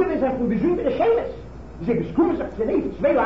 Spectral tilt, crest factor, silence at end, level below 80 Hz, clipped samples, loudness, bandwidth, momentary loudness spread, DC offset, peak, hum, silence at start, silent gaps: -9 dB/octave; 12 dB; 0 s; -42 dBFS; under 0.1%; -22 LUFS; 7.2 kHz; 11 LU; 0.5%; -8 dBFS; none; 0 s; none